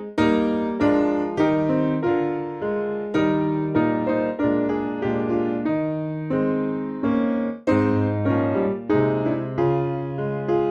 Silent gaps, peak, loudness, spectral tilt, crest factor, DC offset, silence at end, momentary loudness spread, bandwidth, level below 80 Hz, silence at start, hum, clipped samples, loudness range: none; -8 dBFS; -22 LUFS; -9 dB/octave; 14 dB; under 0.1%; 0 s; 6 LU; 7 kHz; -52 dBFS; 0 s; none; under 0.1%; 2 LU